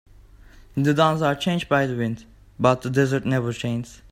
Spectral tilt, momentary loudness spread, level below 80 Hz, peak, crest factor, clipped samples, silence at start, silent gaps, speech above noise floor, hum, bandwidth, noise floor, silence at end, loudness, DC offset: -6.5 dB/octave; 10 LU; -50 dBFS; -2 dBFS; 20 dB; under 0.1%; 0.75 s; none; 26 dB; none; 15.5 kHz; -48 dBFS; 0.15 s; -22 LUFS; under 0.1%